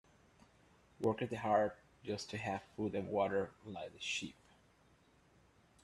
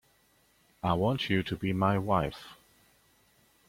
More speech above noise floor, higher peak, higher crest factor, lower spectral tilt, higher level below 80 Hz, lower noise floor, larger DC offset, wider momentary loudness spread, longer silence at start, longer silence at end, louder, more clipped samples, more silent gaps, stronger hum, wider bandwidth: second, 31 dB vs 38 dB; second, -20 dBFS vs -12 dBFS; about the same, 22 dB vs 20 dB; second, -5 dB/octave vs -7 dB/octave; second, -72 dBFS vs -56 dBFS; about the same, -69 dBFS vs -67 dBFS; neither; about the same, 12 LU vs 10 LU; first, 1 s vs 0.85 s; first, 1.5 s vs 1.15 s; second, -39 LUFS vs -30 LUFS; neither; neither; neither; second, 12.5 kHz vs 16 kHz